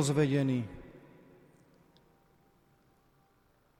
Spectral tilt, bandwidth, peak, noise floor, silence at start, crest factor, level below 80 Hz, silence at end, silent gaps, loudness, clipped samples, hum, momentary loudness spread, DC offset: -6 dB/octave; 13.5 kHz; -16 dBFS; -69 dBFS; 0 s; 20 dB; -64 dBFS; 2.8 s; none; -31 LUFS; under 0.1%; none; 27 LU; under 0.1%